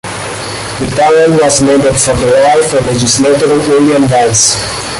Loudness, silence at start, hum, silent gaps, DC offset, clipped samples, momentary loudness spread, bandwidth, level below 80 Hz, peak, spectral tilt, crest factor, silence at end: -9 LUFS; 0.05 s; none; none; under 0.1%; under 0.1%; 10 LU; 12 kHz; -34 dBFS; 0 dBFS; -3.5 dB/octave; 8 dB; 0 s